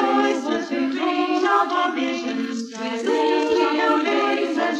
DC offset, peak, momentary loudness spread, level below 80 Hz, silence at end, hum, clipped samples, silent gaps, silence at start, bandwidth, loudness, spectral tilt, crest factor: under 0.1%; -6 dBFS; 7 LU; -68 dBFS; 0 s; none; under 0.1%; none; 0 s; 11 kHz; -21 LUFS; -3.5 dB/octave; 16 dB